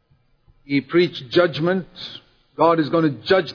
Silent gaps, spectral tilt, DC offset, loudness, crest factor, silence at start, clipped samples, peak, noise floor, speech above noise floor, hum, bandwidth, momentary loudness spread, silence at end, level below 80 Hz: none; -7.5 dB/octave; under 0.1%; -20 LUFS; 18 dB; 0.7 s; under 0.1%; -4 dBFS; -58 dBFS; 39 dB; none; 5.4 kHz; 17 LU; 0 s; -60 dBFS